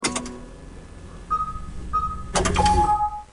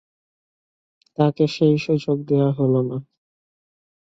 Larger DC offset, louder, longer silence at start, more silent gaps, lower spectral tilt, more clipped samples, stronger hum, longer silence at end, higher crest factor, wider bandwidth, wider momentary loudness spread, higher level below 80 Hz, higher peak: neither; second, -23 LUFS vs -20 LUFS; second, 0 s vs 1.2 s; neither; second, -4 dB/octave vs -8.5 dB/octave; neither; neither; second, 0.05 s vs 1.05 s; about the same, 18 dB vs 18 dB; first, 11 kHz vs 7.8 kHz; first, 23 LU vs 9 LU; first, -32 dBFS vs -64 dBFS; about the same, -6 dBFS vs -4 dBFS